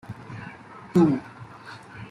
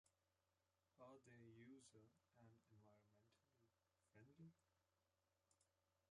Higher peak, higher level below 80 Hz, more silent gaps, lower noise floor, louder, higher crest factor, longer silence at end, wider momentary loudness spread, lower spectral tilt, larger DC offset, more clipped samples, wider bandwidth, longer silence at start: first, -8 dBFS vs -54 dBFS; first, -60 dBFS vs under -90 dBFS; neither; second, -44 dBFS vs under -90 dBFS; first, -23 LUFS vs -68 LUFS; about the same, 18 dB vs 18 dB; about the same, 0.05 s vs 0 s; first, 22 LU vs 2 LU; first, -8.5 dB/octave vs -5.5 dB/octave; neither; neither; about the same, 11 kHz vs 10 kHz; about the same, 0.1 s vs 0.05 s